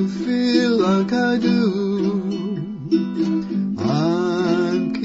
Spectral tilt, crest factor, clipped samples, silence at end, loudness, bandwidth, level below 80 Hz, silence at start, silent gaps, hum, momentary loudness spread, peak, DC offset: -7 dB/octave; 16 dB; under 0.1%; 0 s; -20 LUFS; 8 kHz; -56 dBFS; 0 s; none; none; 6 LU; -4 dBFS; under 0.1%